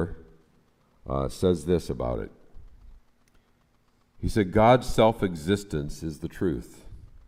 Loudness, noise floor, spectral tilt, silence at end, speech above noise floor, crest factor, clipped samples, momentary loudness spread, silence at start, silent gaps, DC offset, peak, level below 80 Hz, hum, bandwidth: -26 LUFS; -65 dBFS; -6.5 dB/octave; 0.2 s; 40 dB; 22 dB; under 0.1%; 15 LU; 0 s; none; under 0.1%; -4 dBFS; -42 dBFS; none; 16 kHz